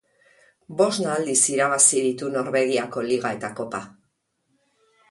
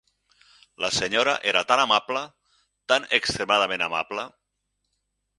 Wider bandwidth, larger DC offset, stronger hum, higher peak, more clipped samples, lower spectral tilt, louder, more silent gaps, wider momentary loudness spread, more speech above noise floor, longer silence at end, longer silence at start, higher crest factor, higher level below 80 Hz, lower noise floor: about the same, 11.5 kHz vs 11.5 kHz; neither; second, none vs 50 Hz at -70 dBFS; about the same, -2 dBFS vs -2 dBFS; neither; about the same, -2.5 dB/octave vs -1.5 dB/octave; about the same, -21 LUFS vs -23 LUFS; neither; first, 15 LU vs 12 LU; second, 50 dB vs 54 dB; about the same, 1.2 s vs 1.1 s; about the same, 0.7 s vs 0.8 s; about the same, 22 dB vs 24 dB; second, -68 dBFS vs -60 dBFS; second, -72 dBFS vs -78 dBFS